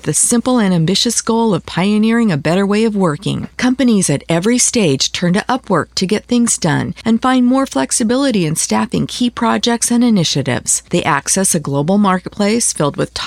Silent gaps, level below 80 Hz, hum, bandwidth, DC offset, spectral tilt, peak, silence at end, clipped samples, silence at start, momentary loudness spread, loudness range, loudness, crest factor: none; -46 dBFS; none; 15.5 kHz; under 0.1%; -4 dB/octave; 0 dBFS; 0 s; under 0.1%; 0.05 s; 5 LU; 1 LU; -14 LUFS; 14 dB